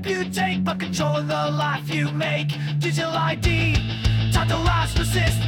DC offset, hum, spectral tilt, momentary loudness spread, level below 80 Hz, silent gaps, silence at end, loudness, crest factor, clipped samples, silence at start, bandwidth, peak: under 0.1%; none; -5.5 dB/octave; 4 LU; -32 dBFS; none; 0 s; -22 LUFS; 16 dB; under 0.1%; 0 s; 17 kHz; -6 dBFS